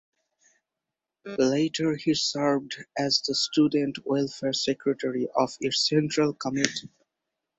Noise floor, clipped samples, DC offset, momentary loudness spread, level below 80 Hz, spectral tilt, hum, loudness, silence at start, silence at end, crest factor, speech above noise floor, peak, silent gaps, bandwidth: -87 dBFS; under 0.1%; under 0.1%; 6 LU; -68 dBFS; -4 dB/octave; none; -26 LUFS; 1.25 s; 0.7 s; 26 dB; 61 dB; -2 dBFS; none; 8.4 kHz